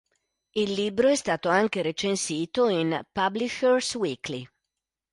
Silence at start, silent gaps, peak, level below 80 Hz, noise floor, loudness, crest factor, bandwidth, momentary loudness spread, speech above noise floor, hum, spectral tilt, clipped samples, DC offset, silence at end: 0.55 s; none; -10 dBFS; -64 dBFS; -86 dBFS; -26 LUFS; 16 dB; 11.5 kHz; 7 LU; 60 dB; none; -4 dB/octave; under 0.1%; under 0.1%; 0.65 s